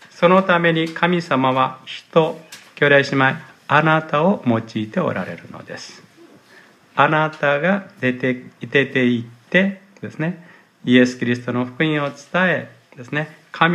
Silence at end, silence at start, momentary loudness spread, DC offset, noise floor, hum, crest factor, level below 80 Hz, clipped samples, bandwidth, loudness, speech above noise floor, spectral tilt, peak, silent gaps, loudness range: 0 s; 0.15 s; 17 LU; under 0.1%; -49 dBFS; none; 20 dB; -66 dBFS; under 0.1%; 11 kHz; -18 LUFS; 31 dB; -6.5 dB/octave; 0 dBFS; none; 4 LU